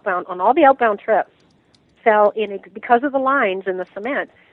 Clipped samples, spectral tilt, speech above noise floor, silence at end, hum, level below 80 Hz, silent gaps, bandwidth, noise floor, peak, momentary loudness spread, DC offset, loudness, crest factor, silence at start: under 0.1%; -7.5 dB/octave; 39 dB; 0.25 s; none; -66 dBFS; none; 4.3 kHz; -57 dBFS; -2 dBFS; 12 LU; under 0.1%; -18 LUFS; 18 dB; 0.05 s